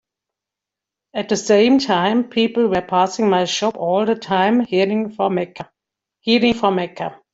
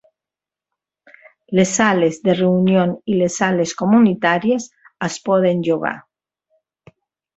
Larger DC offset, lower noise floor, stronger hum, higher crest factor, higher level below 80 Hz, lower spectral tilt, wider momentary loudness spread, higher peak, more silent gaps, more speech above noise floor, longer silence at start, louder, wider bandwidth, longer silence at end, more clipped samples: neither; about the same, -86 dBFS vs -88 dBFS; neither; about the same, 16 dB vs 18 dB; about the same, -56 dBFS vs -60 dBFS; about the same, -5 dB/octave vs -5.5 dB/octave; first, 13 LU vs 10 LU; about the same, -2 dBFS vs -2 dBFS; neither; second, 68 dB vs 72 dB; second, 1.15 s vs 1.5 s; about the same, -18 LUFS vs -17 LUFS; about the same, 8 kHz vs 8.2 kHz; second, 0.2 s vs 1.35 s; neither